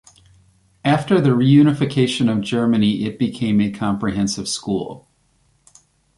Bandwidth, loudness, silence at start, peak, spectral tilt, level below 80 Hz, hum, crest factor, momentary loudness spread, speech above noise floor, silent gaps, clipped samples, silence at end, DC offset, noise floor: 11.5 kHz; -18 LUFS; 0.85 s; -2 dBFS; -6 dB/octave; -50 dBFS; none; 16 dB; 10 LU; 44 dB; none; under 0.1%; 1.2 s; under 0.1%; -61 dBFS